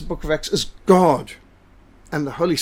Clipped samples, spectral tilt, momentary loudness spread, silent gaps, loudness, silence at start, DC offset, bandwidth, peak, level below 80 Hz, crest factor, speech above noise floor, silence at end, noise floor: under 0.1%; -5 dB/octave; 13 LU; none; -20 LUFS; 0 s; under 0.1%; 16.5 kHz; -2 dBFS; -40 dBFS; 20 dB; 31 dB; 0 s; -50 dBFS